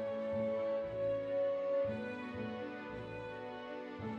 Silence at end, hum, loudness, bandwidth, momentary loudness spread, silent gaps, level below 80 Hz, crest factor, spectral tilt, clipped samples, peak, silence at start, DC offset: 0 s; none; -39 LUFS; 6.4 kHz; 10 LU; none; -66 dBFS; 12 dB; -7.5 dB/octave; under 0.1%; -26 dBFS; 0 s; under 0.1%